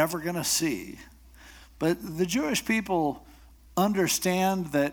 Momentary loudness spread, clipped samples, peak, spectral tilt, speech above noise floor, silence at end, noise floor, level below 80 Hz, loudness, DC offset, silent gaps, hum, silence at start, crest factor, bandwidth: 10 LU; under 0.1%; -10 dBFS; -4 dB/octave; 24 dB; 0 s; -51 dBFS; -54 dBFS; -27 LUFS; under 0.1%; none; none; 0 s; 18 dB; over 20 kHz